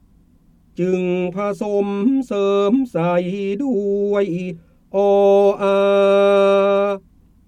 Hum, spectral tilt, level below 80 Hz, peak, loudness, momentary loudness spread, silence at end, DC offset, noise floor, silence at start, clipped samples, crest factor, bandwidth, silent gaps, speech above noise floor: none; -7.5 dB/octave; -56 dBFS; -4 dBFS; -17 LUFS; 10 LU; 0.5 s; under 0.1%; -53 dBFS; 0.8 s; under 0.1%; 14 dB; 9 kHz; none; 36 dB